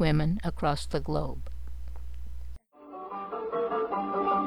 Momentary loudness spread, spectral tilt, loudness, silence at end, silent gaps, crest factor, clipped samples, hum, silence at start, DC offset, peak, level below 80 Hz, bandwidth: 17 LU; -7 dB/octave; -31 LUFS; 0 s; none; 16 dB; under 0.1%; none; 0 s; 2%; -12 dBFS; -40 dBFS; 12 kHz